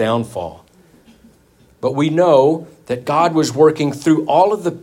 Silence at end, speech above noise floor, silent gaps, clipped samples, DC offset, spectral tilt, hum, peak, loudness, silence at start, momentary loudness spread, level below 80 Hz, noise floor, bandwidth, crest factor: 0.05 s; 36 dB; none; under 0.1%; under 0.1%; -6 dB/octave; none; 0 dBFS; -15 LUFS; 0 s; 13 LU; -58 dBFS; -52 dBFS; 15.5 kHz; 16 dB